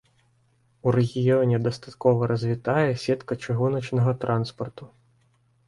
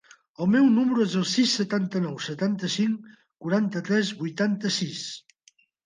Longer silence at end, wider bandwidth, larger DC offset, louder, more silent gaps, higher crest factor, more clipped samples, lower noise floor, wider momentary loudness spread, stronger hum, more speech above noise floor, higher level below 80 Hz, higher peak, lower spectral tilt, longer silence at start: first, 0.8 s vs 0.65 s; first, 11 kHz vs 9.8 kHz; neither; about the same, -24 LUFS vs -25 LUFS; neither; about the same, 18 dB vs 14 dB; neither; about the same, -65 dBFS vs -62 dBFS; second, 7 LU vs 11 LU; neither; about the same, 41 dB vs 38 dB; first, -58 dBFS vs -72 dBFS; first, -6 dBFS vs -10 dBFS; first, -8 dB/octave vs -5 dB/octave; first, 0.85 s vs 0.4 s